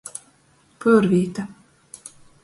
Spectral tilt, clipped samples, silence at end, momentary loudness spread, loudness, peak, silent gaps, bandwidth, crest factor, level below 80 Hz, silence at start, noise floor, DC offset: -7 dB/octave; under 0.1%; 0.95 s; 24 LU; -20 LUFS; -4 dBFS; none; 11.5 kHz; 18 dB; -60 dBFS; 0.8 s; -58 dBFS; under 0.1%